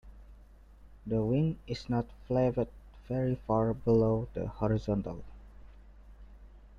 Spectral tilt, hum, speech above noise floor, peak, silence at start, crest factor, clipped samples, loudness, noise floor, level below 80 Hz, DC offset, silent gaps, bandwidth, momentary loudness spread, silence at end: -9.5 dB/octave; 50 Hz at -50 dBFS; 24 dB; -16 dBFS; 0.05 s; 16 dB; under 0.1%; -32 LUFS; -55 dBFS; -50 dBFS; under 0.1%; none; 7.4 kHz; 11 LU; 0.05 s